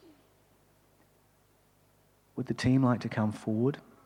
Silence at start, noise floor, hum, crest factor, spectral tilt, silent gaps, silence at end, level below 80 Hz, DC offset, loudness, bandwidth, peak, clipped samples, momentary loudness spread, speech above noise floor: 2.35 s; -66 dBFS; 50 Hz at -65 dBFS; 18 dB; -7.5 dB/octave; none; 0.25 s; -64 dBFS; under 0.1%; -30 LUFS; 11.5 kHz; -16 dBFS; under 0.1%; 12 LU; 38 dB